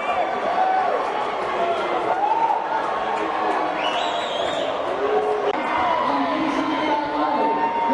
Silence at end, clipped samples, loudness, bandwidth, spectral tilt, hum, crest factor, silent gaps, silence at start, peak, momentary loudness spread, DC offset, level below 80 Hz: 0 s; under 0.1%; -22 LUFS; 11 kHz; -4 dB/octave; none; 14 dB; none; 0 s; -8 dBFS; 3 LU; under 0.1%; -58 dBFS